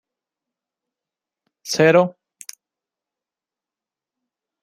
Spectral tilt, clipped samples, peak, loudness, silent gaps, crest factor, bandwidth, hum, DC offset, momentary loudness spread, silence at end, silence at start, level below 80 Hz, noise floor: -5 dB/octave; under 0.1%; -2 dBFS; -17 LUFS; none; 22 dB; 16 kHz; none; under 0.1%; 24 LU; 2.55 s; 1.65 s; -72 dBFS; -89 dBFS